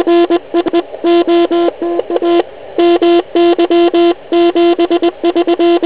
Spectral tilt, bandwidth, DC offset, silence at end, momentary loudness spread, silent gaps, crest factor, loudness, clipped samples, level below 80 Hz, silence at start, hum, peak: -8.5 dB/octave; 4 kHz; 1%; 0 s; 5 LU; none; 10 dB; -11 LUFS; under 0.1%; -52 dBFS; 0 s; none; 0 dBFS